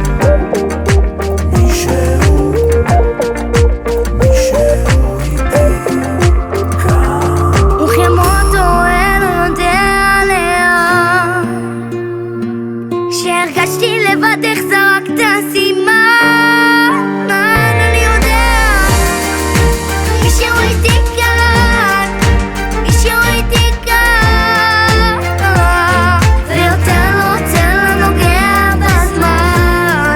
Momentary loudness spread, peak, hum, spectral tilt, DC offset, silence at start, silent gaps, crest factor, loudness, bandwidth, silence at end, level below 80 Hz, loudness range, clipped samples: 6 LU; 0 dBFS; none; -5 dB/octave; under 0.1%; 0 s; none; 10 dB; -11 LUFS; 20 kHz; 0 s; -16 dBFS; 3 LU; under 0.1%